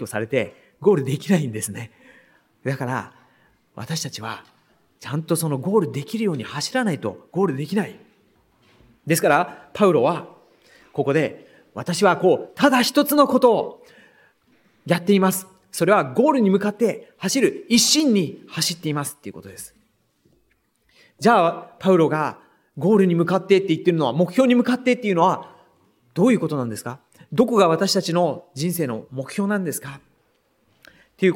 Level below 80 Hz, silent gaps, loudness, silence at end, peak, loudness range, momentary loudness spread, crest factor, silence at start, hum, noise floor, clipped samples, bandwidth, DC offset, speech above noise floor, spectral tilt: -68 dBFS; none; -20 LUFS; 0 s; -2 dBFS; 7 LU; 15 LU; 20 dB; 0 s; none; -66 dBFS; under 0.1%; 17 kHz; under 0.1%; 46 dB; -5 dB/octave